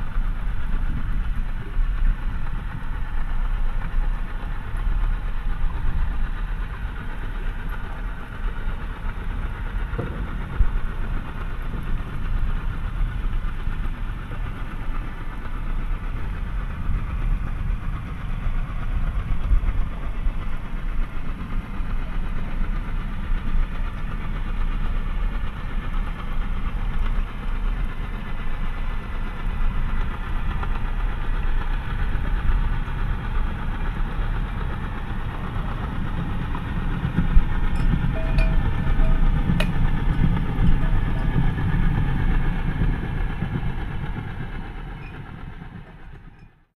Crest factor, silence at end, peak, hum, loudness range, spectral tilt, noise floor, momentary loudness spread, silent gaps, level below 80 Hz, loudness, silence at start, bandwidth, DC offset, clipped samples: 20 dB; 0.3 s; -2 dBFS; none; 8 LU; -7.5 dB/octave; -46 dBFS; 9 LU; none; -24 dBFS; -29 LUFS; 0 s; 4.4 kHz; under 0.1%; under 0.1%